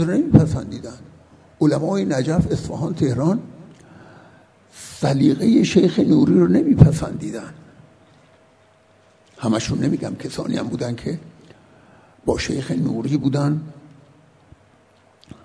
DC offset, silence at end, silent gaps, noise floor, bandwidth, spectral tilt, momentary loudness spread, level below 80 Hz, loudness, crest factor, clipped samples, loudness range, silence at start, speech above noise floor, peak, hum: under 0.1%; 1.65 s; none; -54 dBFS; 11 kHz; -7 dB/octave; 16 LU; -42 dBFS; -19 LUFS; 20 dB; under 0.1%; 9 LU; 0 s; 36 dB; 0 dBFS; none